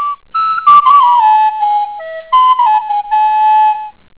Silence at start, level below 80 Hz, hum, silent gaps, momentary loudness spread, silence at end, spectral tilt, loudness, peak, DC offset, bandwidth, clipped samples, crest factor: 0 s; -56 dBFS; none; none; 10 LU; 0.25 s; -4 dB/octave; -10 LUFS; 0 dBFS; 0.3%; 4 kHz; 0.3%; 10 dB